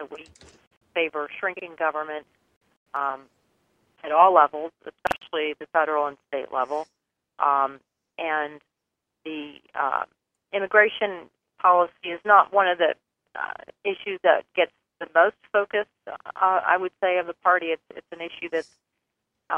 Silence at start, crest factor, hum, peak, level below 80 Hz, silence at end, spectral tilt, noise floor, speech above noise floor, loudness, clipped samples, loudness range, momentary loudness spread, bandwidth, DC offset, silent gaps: 0 s; 24 dB; none; -2 dBFS; -70 dBFS; 0 s; -4.5 dB/octave; -83 dBFS; 59 dB; -24 LUFS; under 0.1%; 8 LU; 18 LU; 10 kHz; under 0.1%; 0.67-0.71 s, 0.77-0.81 s, 2.56-2.61 s, 2.77-2.86 s